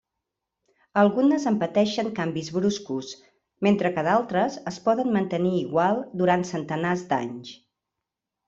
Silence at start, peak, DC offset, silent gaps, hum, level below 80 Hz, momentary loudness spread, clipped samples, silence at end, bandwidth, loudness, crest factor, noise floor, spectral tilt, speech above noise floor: 0.95 s; -6 dBFS; under 0.1%; none; none; -66 dBFS; 10 LU; under 0.1%; 0.95 s; 7.8 kHz; -24 LUFS; 20 dB; -85 dBFS; -6 dB/octave; 62 dB